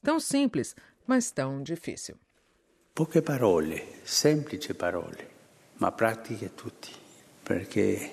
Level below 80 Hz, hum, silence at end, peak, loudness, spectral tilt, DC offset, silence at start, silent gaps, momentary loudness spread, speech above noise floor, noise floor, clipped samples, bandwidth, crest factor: -64 dBFS; none; 0 s; -10 dBFS; -29 LUFS; -4.5 dB/octave; under 0.1%; 0.05 s; none; 17 LU; 39 dB; -68 dBFS; under 0.1%; 14.5 kHz; 20 dB